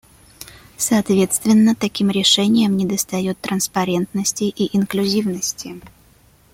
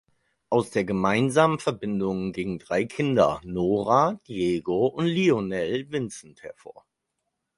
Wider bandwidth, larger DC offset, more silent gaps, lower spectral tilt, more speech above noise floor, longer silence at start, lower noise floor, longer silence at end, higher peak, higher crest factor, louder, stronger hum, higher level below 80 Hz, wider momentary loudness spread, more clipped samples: first, 16.5 kHz vs 11.5 kHz; neither; neither; second, -4 dB/octave vs -6 dB/octave; second, 34 dB vs 56 dB; about the same, 0.4 s vs 0.5 s; second, -52 dBFS vs -80 dBFS; second, 0.65 s vs 0.85 s; first, -2 dBFS vs -6 dBFS; about the same, 16 dB vs 20 dB; first, -18 LUFS vs -25 LUFS; neither; about the same, -54 dBFS vs -56 dBFS; first, 18 LU vs 10 LU; neither